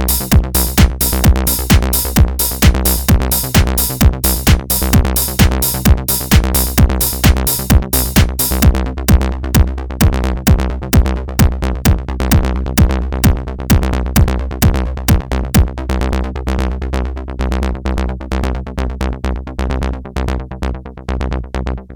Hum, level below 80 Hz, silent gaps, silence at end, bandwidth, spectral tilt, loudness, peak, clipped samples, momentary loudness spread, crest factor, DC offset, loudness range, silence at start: none; -16 dBFS; none; 0 s; 19.5 kHz; -5 dB/octave; -14 LUFS; 0 dBFS; under 0.1%; 9 LU; 14 dB; under 0.1%; 8 LU; 0 s